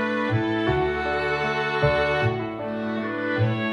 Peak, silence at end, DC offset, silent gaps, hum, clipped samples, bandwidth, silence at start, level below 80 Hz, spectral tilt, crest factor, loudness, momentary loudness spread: -6 dBFS; 0 s; under 0.1%; none; none; under 0.1%; 10.5 kHz; 0 s; -44 dBFS; -7 dB/octave; 16 dB; -24 LUFS; 7 LU